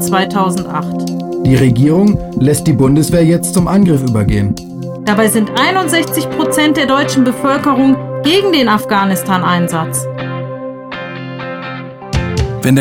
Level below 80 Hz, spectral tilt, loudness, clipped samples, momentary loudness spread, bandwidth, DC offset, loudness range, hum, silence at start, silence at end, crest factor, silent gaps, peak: -32 dBFS; -5.5 dB/octave; -12 LUFS; under 0.1%; 13 LU; 18 kHz; under 0.1%; 6 LU; none; 0 s; 0 s; 12 dB; none; 0 dBFS